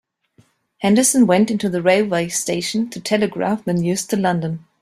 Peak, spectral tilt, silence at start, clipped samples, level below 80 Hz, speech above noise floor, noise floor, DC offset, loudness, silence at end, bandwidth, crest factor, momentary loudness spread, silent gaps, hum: -2 dBFS; -4.5 dB/octave; 0.8 s; under 0.1%; -58 dBFS; 39 dB; -57 dBFS; under 0.1%; -18 LUFS; 0.25 s; 15.5 kHz; 16 dB; 8 LU; none; none